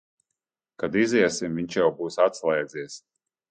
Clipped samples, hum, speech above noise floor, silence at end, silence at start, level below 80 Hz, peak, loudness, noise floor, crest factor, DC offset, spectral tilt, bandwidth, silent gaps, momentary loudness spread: under 0.1%; none; 61 dB; 0.55 s; 0.8 s; -64 dBFS; -8 dBFS; -24 LUFS; -85 dBFS; 18 dB; under 0.1%; -4.5 dB/octave; 9.4 kHz; none; 14 LU